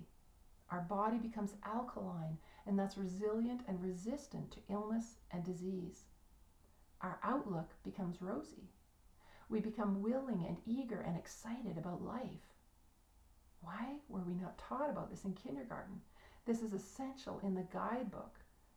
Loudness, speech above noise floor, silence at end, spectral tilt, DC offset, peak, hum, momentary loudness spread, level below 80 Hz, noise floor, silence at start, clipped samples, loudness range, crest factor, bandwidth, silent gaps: -43 LUFS; 26 dB; 0.35 s; -7 dB/octave; under 0.1%; -26 dBFS; none; 11 LU; -66 dBFS; -69 dBFS; 0 s; under 0.1%; 5 LU; 18 dB; over 20 kHz; none